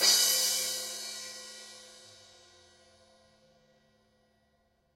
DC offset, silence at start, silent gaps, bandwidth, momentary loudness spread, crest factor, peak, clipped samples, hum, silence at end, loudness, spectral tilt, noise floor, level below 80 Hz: under 0.1%; 0 s; none; 16 kHz; 27 LU; 24 dB; -10 dBFS; under 0.1%; none; 2.9 s; -28 LUFS; 2.5 dB/octave; -72 dBFS; -80 dBFS